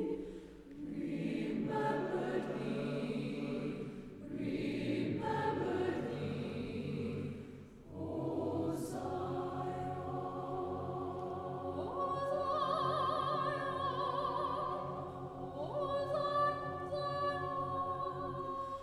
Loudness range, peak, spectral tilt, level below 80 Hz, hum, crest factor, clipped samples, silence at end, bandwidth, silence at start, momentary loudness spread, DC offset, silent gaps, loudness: 4 LU; -24 dBFS; -7 dB/octave; -64 dBFS; none; 16 dB; under 0.1%; 0 s; 14.5 kHz; 0 s; 9 LU; under 0.1%; none; -38 LUFS